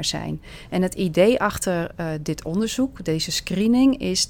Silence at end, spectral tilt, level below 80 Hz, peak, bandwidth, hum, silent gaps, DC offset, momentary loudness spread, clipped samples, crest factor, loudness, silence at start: 0 s; -4.5 dB/octave; -44 dBFS; -4 dBFS; 18 kHz; none; none; under 0.1%; 11 LU; under 0.1%; 18 dB; -22 LUFS; 0 s